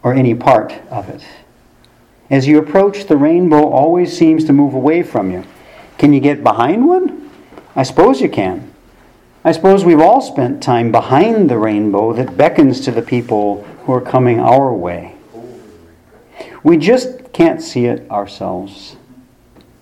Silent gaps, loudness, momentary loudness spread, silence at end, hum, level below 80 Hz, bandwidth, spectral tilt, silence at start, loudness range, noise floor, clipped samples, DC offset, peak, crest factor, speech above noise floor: none; -12 LUFS; 13 LU; 0.9 s; none; -48 dBFS; 11.5 kHz; -7.5 dB/octave; 0.05 s; 4 LU; -48 dBFS; 0.2%; under 0.1%; 0 dBFS; 12 dB; 36 dB